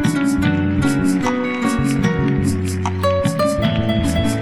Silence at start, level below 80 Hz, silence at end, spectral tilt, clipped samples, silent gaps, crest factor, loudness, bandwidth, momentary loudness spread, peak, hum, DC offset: 0 s; -34 dBFS; 0 s; -6 dB/octave; under 0.1%; none; 14 dB; -18 LUFS; 16.5 kHz; 2 LU; -4 dBFS; none; under 0.1%